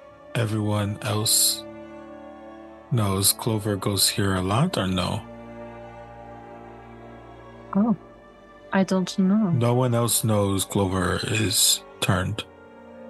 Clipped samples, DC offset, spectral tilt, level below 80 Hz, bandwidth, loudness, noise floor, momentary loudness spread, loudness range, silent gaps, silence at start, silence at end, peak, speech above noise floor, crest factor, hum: under 0.1%; under 0.1%; -4 dB/octave; -58 dBFS; 13 kHz; -23 LUFS; -48 dBFS; 23 LU; 9 LU; none; 0 s; 0 s; -6 dBFS; 25 dB; 18 dB; none